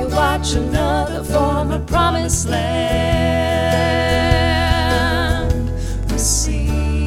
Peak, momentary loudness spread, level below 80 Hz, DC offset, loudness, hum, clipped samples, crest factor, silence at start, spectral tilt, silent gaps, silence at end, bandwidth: 0 dBFS; 4 LU; -24 dBFS; under 0.1%; -17 LUFS; none; under 0.1%; 16 dB; 0 s; -4.5 dB/octave; none; 0 s; 16 kHz